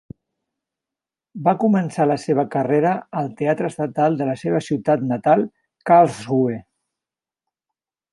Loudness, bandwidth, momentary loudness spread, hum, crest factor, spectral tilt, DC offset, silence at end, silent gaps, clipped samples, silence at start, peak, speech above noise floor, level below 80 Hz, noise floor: -20 LUFS; 11.5 kHz; 8 LU; none; 18 dB; -7.5 dB/octave; under 0.1%; 1.5 s; none; under 0.1%; 1.35 s; -2 dBFS; 70 dB; -64 dBFS; -89 dBFS